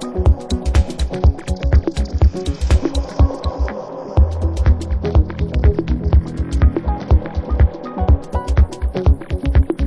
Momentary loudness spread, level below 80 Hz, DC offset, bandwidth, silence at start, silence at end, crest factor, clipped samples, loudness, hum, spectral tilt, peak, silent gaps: 5 LU; -16 dBFS; under 0.1%; 10 kHz; 0 s; 0 s; 14 dB; under 0.1%; -18 LUFS; none; -7.5 dB/octave; -2 dBFS; none